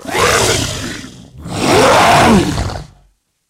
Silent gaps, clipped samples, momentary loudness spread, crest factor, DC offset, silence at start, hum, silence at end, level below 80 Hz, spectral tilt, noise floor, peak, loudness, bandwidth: none; under 0.1%; 19 LU; 14 dB; under 0.1%; 0.05 s; none; 0.65 s; -32 dBFS; -4 dB/octave; -54 dBFS; 0 dBFS; -11 LUFS; 16 kHz